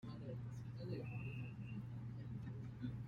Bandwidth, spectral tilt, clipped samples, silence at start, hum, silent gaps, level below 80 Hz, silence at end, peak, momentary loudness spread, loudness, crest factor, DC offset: 7 kHz; -8.5 dB/octave; under 0.1%; 0 s; none; none; -66 dBFS; 0 s; -34 dBFS; 3 LU; -49 LUFS; 14 dB; under 0.1%